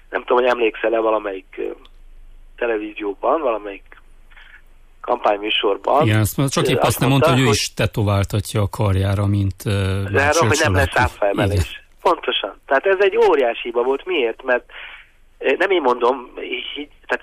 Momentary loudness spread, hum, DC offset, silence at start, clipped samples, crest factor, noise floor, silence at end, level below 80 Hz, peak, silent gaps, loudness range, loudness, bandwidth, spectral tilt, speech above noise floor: 12 LU; none; under 0.1%; 0.1 s; under 0.1%; 14 dB; -45 dBFS; 0.05 s; -40 dBFS; -6 dBFS; none; 6 LU; -19 LUFS; 15.5 kHz; -5 dB/octave; 27 dB